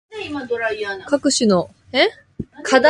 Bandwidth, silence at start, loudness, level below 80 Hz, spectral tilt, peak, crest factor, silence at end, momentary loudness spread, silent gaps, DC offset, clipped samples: 11.5 kHz; 0.1 s; -20 LUFS; -52 dBFS; -3.5 dB/octave; 0 dBFS; 18 dB; 0 s; 12 LU; none; under 0.1%; under 0.1%